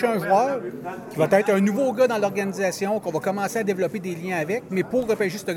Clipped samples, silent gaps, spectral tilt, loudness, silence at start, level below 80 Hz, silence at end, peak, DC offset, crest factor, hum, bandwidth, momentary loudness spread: under 0.1%; none; -5.5 dB/octave; -23 LUFS; 0 s; -62 dBFS; 0 s; -6 dBFS; under 0.1%; 18 dB; none; 17 kHz; 7 LU